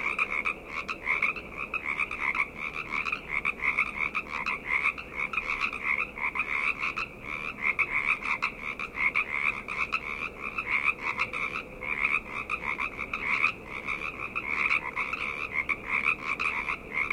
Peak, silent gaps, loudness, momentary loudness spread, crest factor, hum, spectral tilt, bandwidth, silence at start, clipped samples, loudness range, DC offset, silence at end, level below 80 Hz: -10 dBFS; none; -29 LUFS; 7 LU; 20 dB; none; -3.5 dB/octave; 16.5 kHz; 0 s; under 0.1%; 1 LU; under 0.1%; 0 s; -54 dBFS